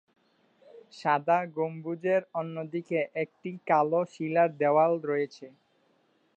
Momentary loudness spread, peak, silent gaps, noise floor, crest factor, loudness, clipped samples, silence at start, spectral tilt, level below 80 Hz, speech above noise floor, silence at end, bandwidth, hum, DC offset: 11 LU; -10 dBFS; none; -69 dBFS; 18 dB; -28 LUFS; under 0.1%; 0.75 s; -7.5 dB/octave; -86 dBFS; 41 dB; 0.9 s; 8.4 kHz; none; under 0.1%